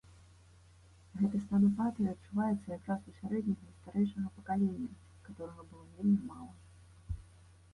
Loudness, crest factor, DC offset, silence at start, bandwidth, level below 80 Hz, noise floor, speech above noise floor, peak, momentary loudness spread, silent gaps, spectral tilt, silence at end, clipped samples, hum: -35 LUFS; 16 dB; under 0.1%; 1.15 s; 11 kHz; -58 dBFS; -60 dBFS; 26 dB; -20 dBFS; 20 LU; none; -9 dB/octave; 0.5 s; under 0.1%; none